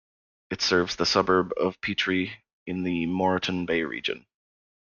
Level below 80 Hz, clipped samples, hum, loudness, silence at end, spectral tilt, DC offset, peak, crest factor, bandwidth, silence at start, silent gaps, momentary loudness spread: -60 dBFS; under 0.1%; none; -26 LUFS; 0.65 s; -4.5 dB/octave; under 0.1%; -8 dBFS; 20 dB; 7.2 kHz; 0.5 s; 2.53-2.66 s; 11 LU